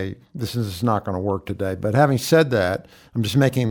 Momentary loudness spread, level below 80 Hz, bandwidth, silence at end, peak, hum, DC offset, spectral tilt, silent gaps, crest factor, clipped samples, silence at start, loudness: 12 LU; -52 dBFS; 19.5 kHz; 0 s; -4 dBFS; none; under 0.1%; -6 dB/octave; none; 16 dB; under 0.1%; 0 s; -21 LUFS